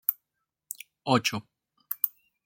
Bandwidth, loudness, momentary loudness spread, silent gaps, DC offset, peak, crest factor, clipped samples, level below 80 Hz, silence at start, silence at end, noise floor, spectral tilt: 17 kHz; -29 LUFS; 16 LU; none; under 0.1%; -6 dBFS; 28 dB; under 0.1%; -74 dBFS; 0.1 s; 0.35 s; -84 dBFS; -4 dB/octave